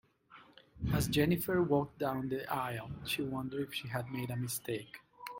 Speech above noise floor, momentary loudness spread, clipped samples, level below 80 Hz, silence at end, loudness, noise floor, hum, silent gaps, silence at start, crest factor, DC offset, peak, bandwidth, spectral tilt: 25 dB; 11 LU; under 0.1%; -56 dBFS; 0 s; -35 LUFS; -60 dBFS; none; none; 0.3 s; 20 dB; under 0.1%; -16 dBFS; 17 kHz; -5.5 dB/octave